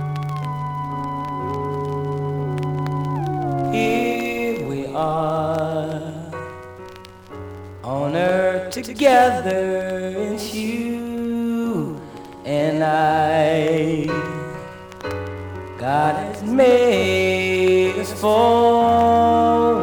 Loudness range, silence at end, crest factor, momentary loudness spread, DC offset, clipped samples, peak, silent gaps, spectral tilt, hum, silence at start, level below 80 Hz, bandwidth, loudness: 8 LU; 0 s; 18 dB; 17 LU; under 0.1%; under 0.1%; -2 dBFS; none; -6 dB/octave; none; 0 s; -54 dBFS; over 20 kHz; -20 LUFS